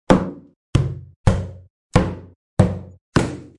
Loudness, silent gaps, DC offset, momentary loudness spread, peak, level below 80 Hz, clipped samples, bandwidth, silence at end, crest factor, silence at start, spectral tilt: -22 LUFS; 0.56-0.73 s, 1.16-1.24 s, 1.70-1.90 s, 2.36-2.57 s, 3.01-3.12 s; under 0.1%; 12 LU; 0 dBFS; -32 dBFS; under 0.1%; 11.5 kHz; 0.15 s; 20 dB; 0.1 s; -7 dB/octave